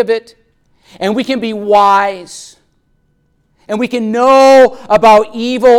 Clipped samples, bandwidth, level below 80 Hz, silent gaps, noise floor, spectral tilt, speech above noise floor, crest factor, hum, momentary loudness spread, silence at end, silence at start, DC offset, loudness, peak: under 0.1%; 14 kHz; -48 dBFS; none; -57 dBFS; -4.5 dB/octave; 48 dB; 10 dB; none; 14 LU; 0 s; 0 s; under 0.1%; -10 LUFS; 0 dBFS